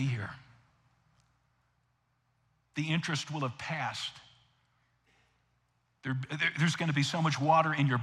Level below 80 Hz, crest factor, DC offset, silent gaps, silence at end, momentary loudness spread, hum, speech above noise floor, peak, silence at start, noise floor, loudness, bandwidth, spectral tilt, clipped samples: -74 dBFS; 20 dB; under 0.1%; none; 0 s; 14 LU; none; 44 dB; -14 dBFS; 0 s; -75 dBFS; -31 LUFS; 12 kHz; -5 dB/octave; under 0.1%